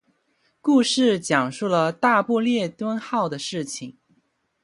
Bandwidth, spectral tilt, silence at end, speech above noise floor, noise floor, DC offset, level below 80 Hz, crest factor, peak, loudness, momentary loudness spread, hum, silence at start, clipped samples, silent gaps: 11.5 kHz; -4.5 dB/octave; 0.7 s; 46 dB; -68 dBFS; under 0.1%; -70 dBFS; 18 dB; -4 dBFS; -22 LUFS; 10 LU; none; 0.65 s; under 0.1%; none